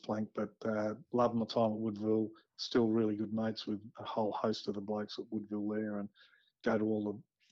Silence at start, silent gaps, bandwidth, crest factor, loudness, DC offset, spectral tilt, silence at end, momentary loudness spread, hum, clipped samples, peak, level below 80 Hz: 0.05 s; none; 7.2 kHz; 16 dB; -36 LUFS; under 0.1%; -7 dB/octave; 0.3 s; 9 LU; none; under 0.1%; -20 dBFS; -74 dBFS